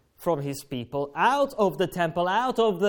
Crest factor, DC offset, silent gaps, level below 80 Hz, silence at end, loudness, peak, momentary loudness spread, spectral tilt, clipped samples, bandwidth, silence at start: 16 dB; under 0.1%; none; -58 dBFS; 0 s; -26 LUFS; -10 dBFS; 9 LU; -5.5 dB/octave; under 0.1%; 18 kHz; 0.2 s